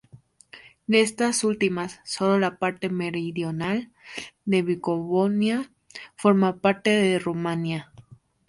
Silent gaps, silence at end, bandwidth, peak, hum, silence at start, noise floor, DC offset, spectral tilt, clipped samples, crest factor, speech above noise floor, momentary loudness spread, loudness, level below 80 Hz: none; 0.45 s; 11.5 kHz; -6 dBFS; none; 0.15 s; -53 dBFS; under 0.1%; -5 dB/octave; under 0.1%; 18 dB; 29 dB; 13 LU; -24 LUFS; -64 dBFS